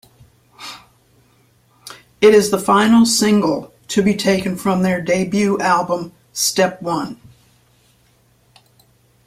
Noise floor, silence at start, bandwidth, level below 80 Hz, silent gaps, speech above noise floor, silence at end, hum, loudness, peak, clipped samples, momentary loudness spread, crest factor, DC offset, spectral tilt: -56 dBFS; 0.6 s; 16 kHz; -54 dBFS; none; 41 dB; 2.1 s; none; -16 LUFS; -2 dBFS; under 0.1%; 22 LU; 16 dB; under 0.1%; -4.5 dB/octave